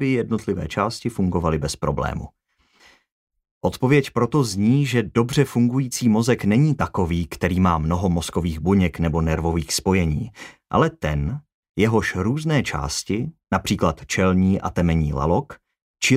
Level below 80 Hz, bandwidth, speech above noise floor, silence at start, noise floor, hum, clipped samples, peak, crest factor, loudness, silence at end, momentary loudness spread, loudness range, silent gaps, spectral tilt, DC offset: -40 dBFS; 16 kHz; 37 dB; 0 s; -58 dBFS; none; under 0.1%; -4 dBFS; 16 dB; -21 LUFS; 0 s; 7 LU; 4 LU; 3.12-3.27 s, 3.51-3.61 s, 11.54-11.63 s, 11.69-11.74 s, 15.82-15.94 s; -6 dB/octave; under 0.1%